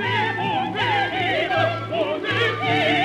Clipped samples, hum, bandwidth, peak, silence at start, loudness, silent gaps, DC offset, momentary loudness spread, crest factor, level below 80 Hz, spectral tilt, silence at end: under 0.1%; none; 12.5 kHz; -8 dBFS; 0 s; -21 LUFS; none; under 0.1%; 3 LU; 14 dB; -56 dBFS; -5.5 dB/octave; 0 s